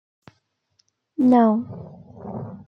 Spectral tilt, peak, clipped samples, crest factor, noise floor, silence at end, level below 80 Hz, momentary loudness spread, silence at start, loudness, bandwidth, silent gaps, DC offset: -9.5 dB/octave; -6 dBFS; under 0.1%; 18 dB; -68 dBFS; 0.1 s; -64 dBFS; 24 LU; 1.2 s; -18 LUFS; 5.6 kHz; none; under 0.1%